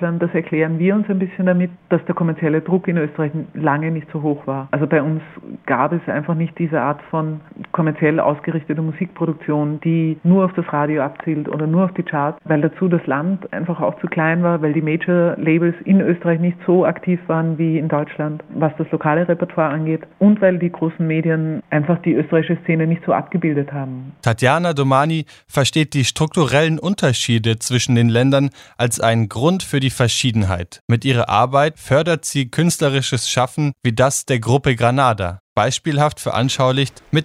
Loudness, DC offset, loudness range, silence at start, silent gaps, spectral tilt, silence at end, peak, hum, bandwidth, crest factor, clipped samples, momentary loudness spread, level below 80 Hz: -18 LUFS; under 0.1%; 3 LU; 0 s; 30.81-30.88 s, 35.40-35.56 s; -5.5 dB/octave; 0 s; 0 dBFS; none; 14.5 kHz; 18 dB; under 0.1%; 7 LU; -52 dBFS